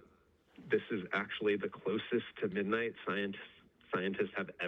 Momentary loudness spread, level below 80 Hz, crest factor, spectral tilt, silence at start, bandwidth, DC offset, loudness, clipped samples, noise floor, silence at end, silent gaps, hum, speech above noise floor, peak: 4 LU; -76 dBFS; 18 dB; -7.5 dB/octave; 0.6 s; 6 kHz; under 0.1%; -37 LUFS; under 0.1%; -68 dBFS; 0 s; none; none; 32 dB; -20 dBFS